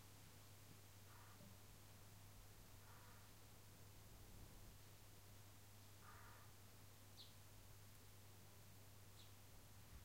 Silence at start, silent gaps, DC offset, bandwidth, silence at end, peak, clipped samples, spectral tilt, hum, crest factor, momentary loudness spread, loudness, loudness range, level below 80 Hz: 0 s; none; under 0.1%; 16 kHz; 0 s; -48 dBFS; under 0.1%; -3.5 dB/octave; none; 16 dB; 2 LU; -64 LUFS; 0 LU; -72 dBFS